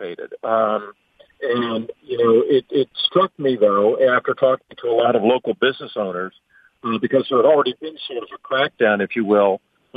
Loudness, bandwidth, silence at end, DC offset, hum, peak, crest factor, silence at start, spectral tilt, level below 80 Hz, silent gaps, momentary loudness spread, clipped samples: -19 LUFS; 5 kHz; 0.4 s; under 0.1%; none; -4 dBFS; 16 dB; 0 s; -7.5 dB/octave; -68 dBFS; none; 13 LU; under 0.1%